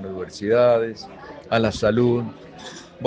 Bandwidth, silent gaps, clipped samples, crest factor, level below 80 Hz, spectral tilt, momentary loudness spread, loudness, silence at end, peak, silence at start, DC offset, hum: 9.2 kHz; none; under 0.1%; 18 dB; -50 dBFS; -6.5 dB/octave; 21 LU; -21 LUFS; 0 s; -4 dBFS; 0 s; under 0.1%; none